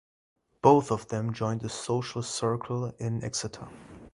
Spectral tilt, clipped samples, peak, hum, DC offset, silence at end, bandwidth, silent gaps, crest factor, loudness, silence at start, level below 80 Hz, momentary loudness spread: -5.5 dB/octave; under 0.1%; -6 dBFS; none; under 0.1%; 0.05 s; 11.5 kHz; none; 24 dB; -29 LUFS; 0.65 s; -60 dBFS; 15 LU